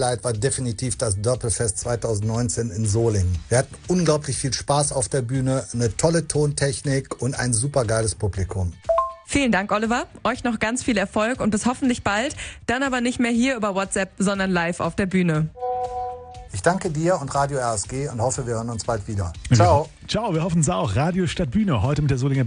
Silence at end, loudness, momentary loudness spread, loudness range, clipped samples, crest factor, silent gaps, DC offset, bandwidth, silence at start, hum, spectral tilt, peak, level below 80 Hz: 0 s; -22 LUFS; 6 LU; 2 LU; under 0.1%; 18 dB; none; under 0.1%; 10 kHz; 0 s; none; -5 dB/octave; -4 dBFS; -42 dBFS